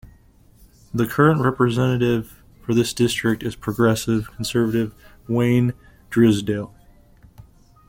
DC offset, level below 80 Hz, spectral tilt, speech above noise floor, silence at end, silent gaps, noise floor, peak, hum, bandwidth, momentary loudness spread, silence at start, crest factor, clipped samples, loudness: under 0.1%; -48 dBFS; -6 dB/octave; 32 dB; 1.25 s; none; -52 dBFS; -2 dBFS; none; 17 kHz; 11 LU; 0.05 s; 20 dB; under 0.1%; -20 LUFS